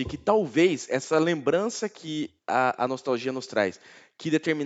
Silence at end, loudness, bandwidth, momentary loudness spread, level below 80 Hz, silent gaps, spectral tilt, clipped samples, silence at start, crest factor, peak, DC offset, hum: 0 s; -26 LUFS; 8.2 kHz; 10 LU; -58 dBFS; none; -5 dB/octave; under 0.1%; 0 s; 20 dB; -6 dBFS; under 0.1%; none